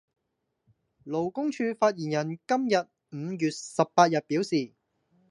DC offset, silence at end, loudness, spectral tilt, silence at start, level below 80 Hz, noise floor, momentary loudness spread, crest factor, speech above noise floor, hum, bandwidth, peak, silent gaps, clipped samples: under 0.1%; 0.65 s; -27 LUFS; -5.5 dB/octave; 1.05 s; -76 dBFS; -80 dBFS; 12 LU; 24 dB; 53 dB; none; 11.5 kHz; -6 dBFS; none; under 0.1%